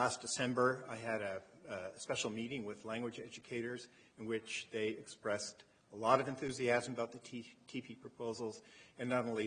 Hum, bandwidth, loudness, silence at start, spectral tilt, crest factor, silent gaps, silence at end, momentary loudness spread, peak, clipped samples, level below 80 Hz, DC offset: none; 9.6 kHz; -40 LUFS; 0 s; -4 dB/octave; 24 dB; none; 0 s; 16 LU; -16 dBFS; under 0.1%; -76 dBFS; under 0.1%